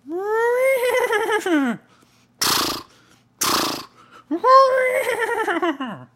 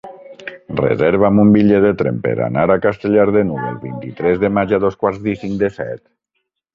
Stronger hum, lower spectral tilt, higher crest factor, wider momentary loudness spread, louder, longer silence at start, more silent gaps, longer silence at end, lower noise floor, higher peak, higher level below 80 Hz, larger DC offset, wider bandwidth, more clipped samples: neither; second, -2 dB/octave vs -9.5 dB/octave; about the same, 18 dB vs 14 dB; second, 12 LU vs 16 LU; second, -19 LUFS vs -15 LUFS; about the same, 0.05 s vs 0.05 s; neither; second, 0.1 s vs 0.75 s; second, -55 dBFS vs -73 dBFS; about the same, -2 dBFS vs -2 dBFS; second, -60 dBFS vs -46 dBFS; neither; first, 16 kHz vs 5.4 kHz; neither